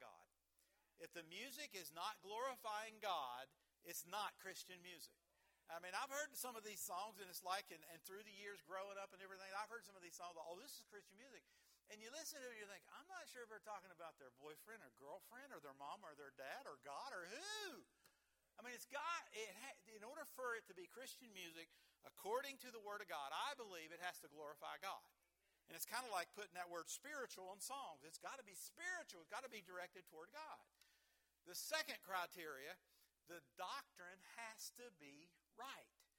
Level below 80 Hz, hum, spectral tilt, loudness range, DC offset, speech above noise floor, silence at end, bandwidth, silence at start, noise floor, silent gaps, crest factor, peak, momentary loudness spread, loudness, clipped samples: under -90 dBFS; none; -1 dB/octave; 6 LU; under 0.1%; 31 dB; 0.15 s; 18 kHz; 0 s; -85 dBFS; none; 26 dB; -28 dBFS; 13 LU; -53 LUFS; under 0.1%